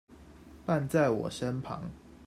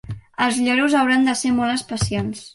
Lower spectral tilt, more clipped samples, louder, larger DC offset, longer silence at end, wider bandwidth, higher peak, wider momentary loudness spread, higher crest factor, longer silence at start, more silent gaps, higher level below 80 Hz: first, -6.5 dB/octave vs -4 dB/octave; neither; second, -32 LUFS vs -19 LUFS; neither; about the same, 0 s vs 0.05 s; first, 15 kHz vs 11.5 kHz; second, -14 dBFS vs -4 dBFS; first, 14 LU vs 7 LU; about the same, 18 dB vs 16 dB; about the same, 0.1 s vs 0.05 s; neither; second, -58 dBFS vs -44 dBFS